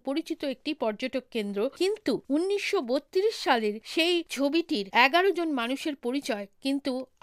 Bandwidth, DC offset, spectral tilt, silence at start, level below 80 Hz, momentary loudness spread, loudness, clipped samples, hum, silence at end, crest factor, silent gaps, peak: 15.5 kHz; under 0.1%; -3.5 dB/octave; 0.05 s; -72 dBFS; 9 LU; -28 LUFS; under 0.1%; none; 0.15 s; 20 dB; none; -8 dBFS